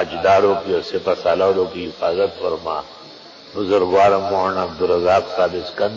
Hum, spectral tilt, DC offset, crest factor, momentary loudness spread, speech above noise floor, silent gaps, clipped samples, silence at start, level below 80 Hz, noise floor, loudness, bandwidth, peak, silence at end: none; -5.5 dB/octave; under 0.1%; 14 dB; 12 LU; 22 dB; none; under 0.1%; 0 s; -48 dBFS; -40 dBFS; -18 LUFS; 7.6 kHz; -4 dBFS; 0 s